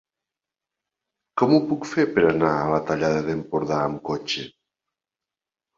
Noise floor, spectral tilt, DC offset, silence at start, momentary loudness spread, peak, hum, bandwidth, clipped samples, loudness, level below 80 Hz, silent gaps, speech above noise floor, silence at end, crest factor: -89 dBFS; -6 dB/octave; under 0.1%; 1.35 s; 10 LU; -4 dBFS; none; 7.6 kHz; under 0.1%; -23 LUFS; -56 dBFS; none; 67 dB; 1.3 s; 20 dB